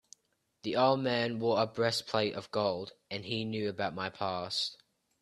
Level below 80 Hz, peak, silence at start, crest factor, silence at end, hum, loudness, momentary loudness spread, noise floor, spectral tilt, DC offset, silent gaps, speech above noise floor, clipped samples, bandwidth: -72 dBFS; -14 dBFS; 0.65 s; 20 dB; 0.45 s; none; -33 LUFS; 9 LU; -77 dBFS; -5 dB/octave; under 0.1%; none; 45 dB; under 0.1%; 13 kHz